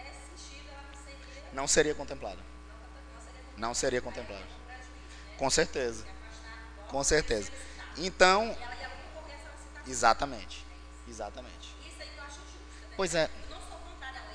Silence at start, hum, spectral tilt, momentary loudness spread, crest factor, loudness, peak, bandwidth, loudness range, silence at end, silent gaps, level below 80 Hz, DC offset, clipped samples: 0 s; 60 Hz at -50 dBFS; -2.5 dB/octave; 22 LU; 26 dB; -31 LUFS; -8 dBFS; 10 kHz; 8 LU; 0 s; none; -48 dBFS; under 0.1%; under 0.1%